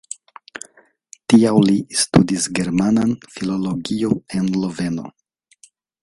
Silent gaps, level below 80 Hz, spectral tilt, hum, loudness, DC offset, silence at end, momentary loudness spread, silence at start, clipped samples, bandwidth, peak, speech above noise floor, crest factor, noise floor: none; -50 dBFS; -5 dB/octave; none; -18 LUFS; under 0.1%; 0.95 s; 21 LU; 1.3 s; under 0.1%; 11.5 kHz; 0 dBFS; 36 dB; 20 dB; -53 dBFS